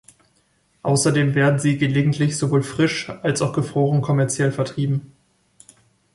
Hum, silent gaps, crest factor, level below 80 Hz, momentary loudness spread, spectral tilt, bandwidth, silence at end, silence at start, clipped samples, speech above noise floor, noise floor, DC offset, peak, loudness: none; none; 16 dB; -56 dBFS; 6 LU; -5.5 dB/octave; 11.5 kHz; 1.1 s; 0.85 s; under 0.1%; 44 dB; -63 dBFS; under 0.1%; -4 dBFS; -20 LUFS